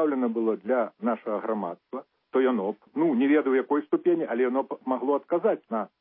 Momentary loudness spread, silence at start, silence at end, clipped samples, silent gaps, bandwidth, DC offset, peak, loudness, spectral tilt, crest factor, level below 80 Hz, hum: 9 LU; 0 s; 0.15 s; under 0.1%; none; 3.8 kHz; under 0.1%; -12 dBFS; -26 LUFS; -10.5 dB/octave; 14 dB; -84 dBFS; none